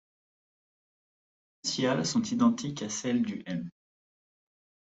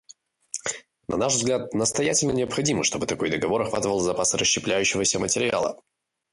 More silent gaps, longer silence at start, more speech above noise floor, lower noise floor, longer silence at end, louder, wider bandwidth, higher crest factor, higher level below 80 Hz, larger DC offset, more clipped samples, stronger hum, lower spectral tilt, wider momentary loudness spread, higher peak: neither; first, 1.65 s vs 0.55 s; first, over 61 dB vs 30 dB; first, under -90 dBFS vs -54 dBFS; first, 1.2 s vs 0.55 s; second, -30 LUFS vs -23 LUFS; second, 8.2 kHz vs 11.5 kHz; about the same, 20 dB vs 16 dB; second, -70 dBFS vs -54 dBFS; neither; neither; neither; first, -4.5 dB/octave vs -3 dB/octave; about the same, 11 LU vs 9 LU; about the same, -12 dBFS vs -10 dBFS